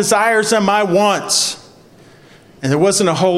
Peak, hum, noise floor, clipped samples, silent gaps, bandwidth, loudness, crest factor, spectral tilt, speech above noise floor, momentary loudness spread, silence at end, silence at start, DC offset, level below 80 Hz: 0 dBFS; none; -44 dBFS; under 0.1%; none; 16 kHz; -14 LUFS; 16 dB; -3.5 dB/octave; 30 dB; 7 LU; 0 s; 0 s; under 0.1%; -58 dBFS